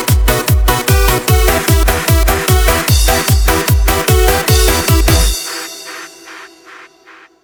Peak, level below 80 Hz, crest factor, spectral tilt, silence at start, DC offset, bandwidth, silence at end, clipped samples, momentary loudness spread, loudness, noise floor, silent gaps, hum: 0 dBFS; -16 dBFS; 12 dB; -4 dB/octave; 0 s; under 0.1%; over 20 kHz; 0.6 s; under 0.1%; 14 LU; -11 LUFS; -42 dBFS; none; none